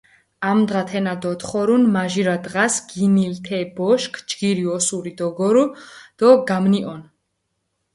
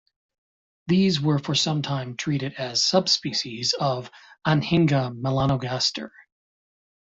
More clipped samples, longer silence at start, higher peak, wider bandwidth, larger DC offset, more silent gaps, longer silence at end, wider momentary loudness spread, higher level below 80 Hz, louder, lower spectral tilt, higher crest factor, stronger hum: neither; second, 0.4 s vs 0.85 s; first, 0 dBFS vs -6 dBFS; first, 11.5 kHz vs 7.8 kHz; neither; neither; about the same, 0.9 s vs 0.95 s; about the same, 10 LU vs 9 LU; second, -62 dBFS vs -56 dBFS; first, -19 LUFS vs -23 LUFS; about the same, -5 dB/octave vs -4.5 dB/octave; about the same, 20 dB vs 20 dB; neither